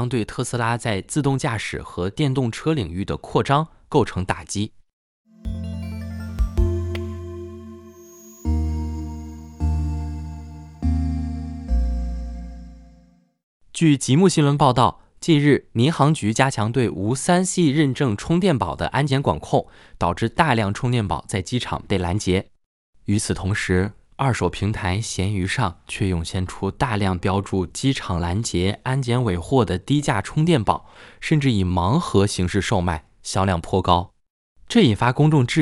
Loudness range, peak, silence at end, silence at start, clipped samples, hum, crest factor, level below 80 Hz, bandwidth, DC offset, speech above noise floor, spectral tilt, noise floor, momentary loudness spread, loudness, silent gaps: 9 LU; 0 dBFS; 0 s; 0 s; under 0.1%; none; 20 dB; -34 dBFS; 12 kHz; under 0.1%; 34 dB; -6 dB/octave; -54 dBFS; 14 LU; -22 LUFS; 4.93-5.25 s, 13.43-13.60 s, 22.66-22.93 s, 34.30-34.55 s